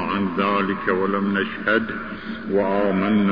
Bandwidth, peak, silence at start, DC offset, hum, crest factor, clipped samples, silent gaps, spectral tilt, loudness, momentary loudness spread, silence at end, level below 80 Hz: 5.2 kHz; -6 dBFS; 0 s; 0.5%; none; 16 dB; under 0.1%; none; -9 dB/octave; -22 LUFS; 9 LU; 0 s; -54 dBFS